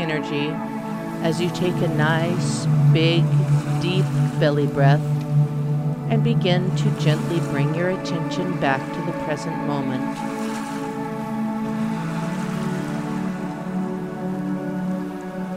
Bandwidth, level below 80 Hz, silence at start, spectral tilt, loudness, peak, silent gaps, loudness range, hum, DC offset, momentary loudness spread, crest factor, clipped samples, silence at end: 12.5 kHz; -54 dBFS; 0 s; -7 dB/octave; -22 LUFS; -4 dBFS; none; 7 LU; none; under 0.1%; 9 LU; 18 dB; under 0.1%; 0 s